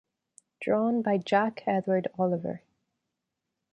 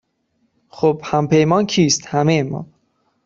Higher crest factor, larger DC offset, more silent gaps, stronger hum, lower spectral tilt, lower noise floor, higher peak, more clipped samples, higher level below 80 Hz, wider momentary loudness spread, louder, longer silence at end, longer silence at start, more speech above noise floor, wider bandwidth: about the same, 18 dB vs 16 dB; neither; neither; neither; first, -7.5 dB/octave vs -5 dB/octave; first, -85 dBFS vs -66 dBFS; second, -12 dBFS vs -2 dBFS; neither; second, -74 dBFS vs -54 dBFS; first, 11 LU vs 5 LU; second, -28 LUFS vs -17 LUFS; first, 1.15 s vs 0.6 s; second, 0.6 s vs 0.75 s; first, 58 dB vs 50 dB; first, 10 kHz vs 7.8 kHz